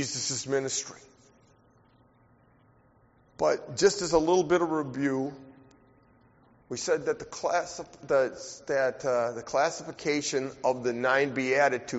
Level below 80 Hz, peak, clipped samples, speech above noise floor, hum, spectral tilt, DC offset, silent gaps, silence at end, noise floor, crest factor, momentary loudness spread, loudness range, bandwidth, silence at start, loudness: -62 dBFS; -10 dBFS; under 0.1%; 34 dB; none; -3.5 dB/octave; under 0.1%; none; 0 s; -62 dBFS; 20 dB; 9 LU; 6 LU; 8 kHz; 0 s; -28 LUFS